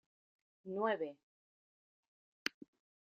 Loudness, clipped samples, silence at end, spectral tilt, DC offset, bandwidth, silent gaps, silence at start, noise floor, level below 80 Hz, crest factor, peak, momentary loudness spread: -41 LUFS; under 0.1%; 0.65 s; -2 dB/octave; under 0.1%; 7.4 kHz; 1.23-2.46 s; 0.65 s; under -90 dBFS; under -90 dBFS; 28 dB; -18 dBFS; 9 LU